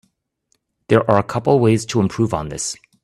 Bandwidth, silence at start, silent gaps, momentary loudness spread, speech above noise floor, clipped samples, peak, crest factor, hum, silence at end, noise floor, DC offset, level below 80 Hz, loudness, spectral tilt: 12.5 kHz; 0.9 s; none; 10 LU; 51 dB; under 0.1%; 0 dBFS; 18 dB; none; 0.3 s; -68 dBFS; under 0.1%; -48 dBFS; -18 LUFS; -6 dB/octave